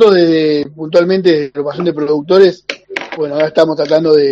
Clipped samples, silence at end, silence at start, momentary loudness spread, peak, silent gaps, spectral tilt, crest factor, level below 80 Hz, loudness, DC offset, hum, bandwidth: 0.4%; 0 s; 0 s; 11 LU; 0 dBFS; none; -6.5 dB/octave; 12 dB; -56 dBFS; -12 LUFS; under 0.1%; none; 7.8 kHz